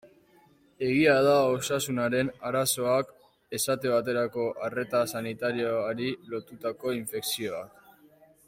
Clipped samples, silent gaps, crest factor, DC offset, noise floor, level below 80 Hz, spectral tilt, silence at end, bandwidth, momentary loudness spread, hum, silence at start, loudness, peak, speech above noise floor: under 0.1%; none; 18 dB; under 0.1%; -61 dBFS; -66 dBFS; -4 dB/octave; 0.8 s; 16.5 kHz; 13 LU; none; 0.05 s; -28 LUFS; -10 dBFS; 33 dB